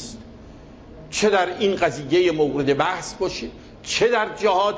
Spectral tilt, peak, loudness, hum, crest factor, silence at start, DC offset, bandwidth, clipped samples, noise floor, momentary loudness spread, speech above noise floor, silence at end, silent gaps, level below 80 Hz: -4 dB/octave; -6 dBFS; -21 LUFS; none; 16 dB; 0 s; under 0.1%; 8 kHz; under 0.1%; -42 dBFS; 14 LU; 22 dB; 0 s; none; -48 dBFS